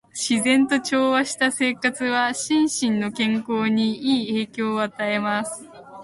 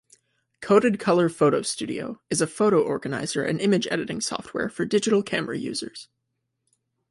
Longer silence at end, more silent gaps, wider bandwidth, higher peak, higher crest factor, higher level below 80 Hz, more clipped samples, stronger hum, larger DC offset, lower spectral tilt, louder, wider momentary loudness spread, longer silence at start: second, 0 s vs 1.1 s; neither; about the same, 11.5 kHz vs 11.5 kHz; about the same, -6 dBFS vs -4 dBFS; about the same, 16 dB vs 20 dB; about the same, -66 dBFS vs -64 dBFS; neither; neither; neither; about the same, -3.5 dB/octave vs -4.5 dB/octave; first, -21 LUFS vs -24 LUFS; second, 6 LU vs 11 LU; second, 0.15 s vs 0.6 s